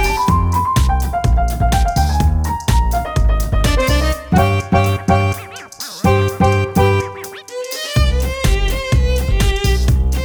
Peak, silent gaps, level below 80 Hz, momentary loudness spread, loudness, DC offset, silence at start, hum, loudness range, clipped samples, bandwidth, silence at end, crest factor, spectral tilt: 0 dBFS; none; -18 dBFS; 6 LU; -16 LUFS; under 0.1%; 0 s; none; 1 LU; under 0.1%; over 20 kHz; 0 s; 14 dB; -5.5 dB/octave